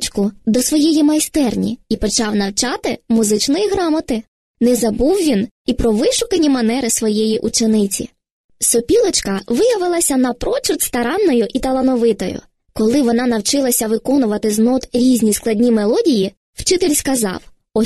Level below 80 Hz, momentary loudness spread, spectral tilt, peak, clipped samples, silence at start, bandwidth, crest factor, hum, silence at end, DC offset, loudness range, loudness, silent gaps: -38 dBFS; 7 LU; -4 dB/octave; -2 dBFS; under 0.1%; 0 s; 13 kHz; 14 dB; none; 0 s; 0.3%; 2 LU; -16 LUFS; 4.28-4.54 s, 5.51-5.65 s, 8.31-8.49 s, 16.37-16.53 s